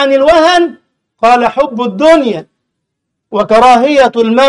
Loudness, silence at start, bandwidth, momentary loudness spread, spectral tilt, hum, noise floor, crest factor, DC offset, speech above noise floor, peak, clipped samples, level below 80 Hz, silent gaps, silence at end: -9 LUFS; 0 s; 11.5 kHz; 11 LU; -4.5 dB/octave; none; -72 dBFS; 10 dB; under 0.1%; 64 dB; 0 dBFS; 0.1%; -42 dBFS; none; 0 s